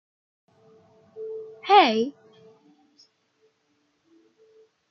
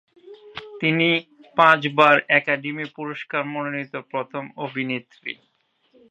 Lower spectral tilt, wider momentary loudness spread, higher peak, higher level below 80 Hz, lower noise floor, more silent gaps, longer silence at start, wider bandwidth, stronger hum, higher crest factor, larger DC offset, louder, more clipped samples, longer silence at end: second, -0.5 dB/octave vs -6.5 dB/octave; about the same, 20 LU vs 18 LU; second, -4 dBFS vs 0 dBFS; second, -84 dBFS vs -74 dBFS; first, -70 dBFS vs -61 dBFS; neither; first, 1.15 s vs 0.25 s; second, 6.4 kHz vs 9.2 kHz; neither; about the same, 24 dB vs 22 dB; neither; about the same, -21 LUFS vs -21 LUFS; neither; first, 2.8 s vs 0.75 s